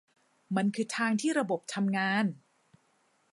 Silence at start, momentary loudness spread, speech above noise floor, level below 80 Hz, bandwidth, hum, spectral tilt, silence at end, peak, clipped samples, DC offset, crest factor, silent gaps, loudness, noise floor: 0.5 s; 6 LU; 41 dB; -84 dBFS; 11.5 kHz; none; -5 dB/octave; 0.95 s; -14 dBFS; under 0.1%; under 0.1%; 18 dB; none; -30 LUFS; -71 dBFS